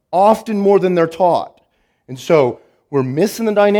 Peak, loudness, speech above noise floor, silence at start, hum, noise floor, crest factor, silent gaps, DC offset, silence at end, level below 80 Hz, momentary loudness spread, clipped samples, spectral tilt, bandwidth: 0 dBFS; -15 LUFS; 47 dB; 0.1 s; none; -61 dBFS; 16 dB; none; under 0.1%; 0 s; -60 dBFS; 17 LU; under 0.1%; -6.5 dB/octave; 18.5 kHz